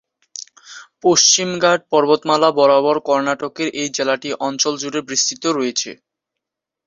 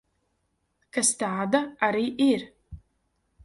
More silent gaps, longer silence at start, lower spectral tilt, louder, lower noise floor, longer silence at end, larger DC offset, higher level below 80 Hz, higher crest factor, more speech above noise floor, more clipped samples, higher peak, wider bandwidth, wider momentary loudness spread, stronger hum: neither; second, 0.35 s vs 0.95 s; about the same, -2 dB/octave vs -3 dB/octave; first, -16 LUFS vs -25 LUFS; first, -82 dBFS vs -74 dBFS; first, 0.9 s vs 0.7 s; neither; second, -64 dBFS vs -58 dBFS; about the same, 18 dB vs 22 dB; first, 66 dB vs 50 dB; neither; first, 0 dBFS vs -6 dBFS; second, 7.8 kHz vs 11.5 kHz; first, 14 LU vs 7 LU; neither